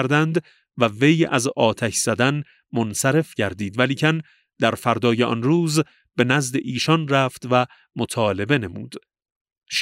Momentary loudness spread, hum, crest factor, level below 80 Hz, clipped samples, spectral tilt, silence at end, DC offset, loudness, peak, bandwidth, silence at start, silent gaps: 10 LU; none; 18 dB; -60 dBFS; under 0.1%; -5 dB/octave; 0 s; under 0.1%; -21 LUFS; -2 dBFS; 16 kHz; 0 s; 9.36-9.45 s